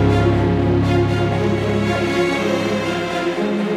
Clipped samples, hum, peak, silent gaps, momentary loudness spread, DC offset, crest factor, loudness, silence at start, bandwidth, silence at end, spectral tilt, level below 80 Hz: under 0.1%; none; -4 dBFS; none; 4 LU; under 0.1%; 12 dB; -18 LUFS; 0 s; 12.5 kHz; 0 s; -7 dB/octave; -34 dBFS